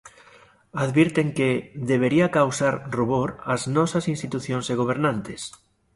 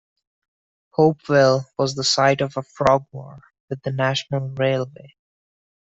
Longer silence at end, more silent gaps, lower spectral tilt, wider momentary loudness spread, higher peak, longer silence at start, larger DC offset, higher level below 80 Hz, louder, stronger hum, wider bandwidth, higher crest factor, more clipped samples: second, 0.45 s vs 0.9 s; second, none vs 3.60-3.68 s; about the same, -6 dB/octave vs -5 dB/octave; second, 9 LU vs 13 LU; about the same, -4 dBFS vs -4 dBFS; second, 0.05 s vs 1 s; neither; about the same, -56 dBFS vs -58 dBFS; second, -23 LUFS vs -20 LUFS; neither; first, 11.5 kHz vs 8.2 kHz; about the same, 18 dB vs 18 dB; neither